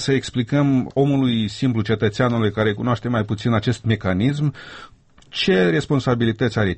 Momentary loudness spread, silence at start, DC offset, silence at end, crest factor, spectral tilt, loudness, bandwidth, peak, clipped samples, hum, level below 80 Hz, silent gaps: 5 LU; 0 s; under 0.1%; 0 s; 14 dB; -6.5 dB/octave; -20 LUFS; 8.6 kHz; -6 dBFS; under 0.1%; none; -48 dBFS; none